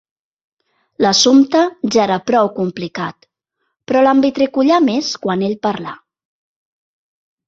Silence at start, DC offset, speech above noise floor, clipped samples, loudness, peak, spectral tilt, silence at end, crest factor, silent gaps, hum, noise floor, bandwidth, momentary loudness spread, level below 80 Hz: 1 s; under 0.1%; 58 dB; under 0.1%; -15 LUFS; 0 dBFS; -4 dB/octave; 1.5 s; 16 dB; none; none; -72 dBFS; 7.8 kHz; 13 LU; -58 dBFS